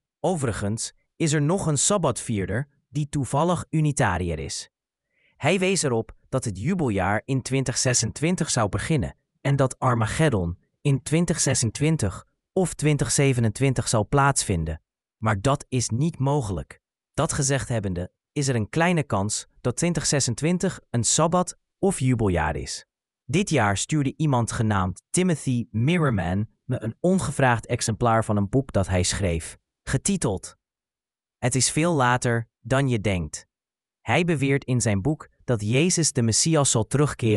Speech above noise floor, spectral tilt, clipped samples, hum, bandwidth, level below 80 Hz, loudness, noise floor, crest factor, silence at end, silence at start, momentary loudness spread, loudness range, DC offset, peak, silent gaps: over 67 dB; -4.5 dB/octave; under 0.1%; none; 13.5 kHz; -44 dBFS; -24 LUFS; under -90 dBFS; 20 dB; 0 s; 0.25 s; 10 LU; 3 LU; under 0.1%; -4 dBFS; none